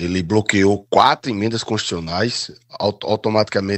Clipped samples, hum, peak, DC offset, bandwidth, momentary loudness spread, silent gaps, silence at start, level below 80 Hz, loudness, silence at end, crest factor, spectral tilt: under 0.1%; none; 0 dBFS; under 0.1%; 9.8 kHz; 8 LU; none; 0 s; -56 dBFS; -18 LUFS; 0 s; 18 dB; -5 dB/octave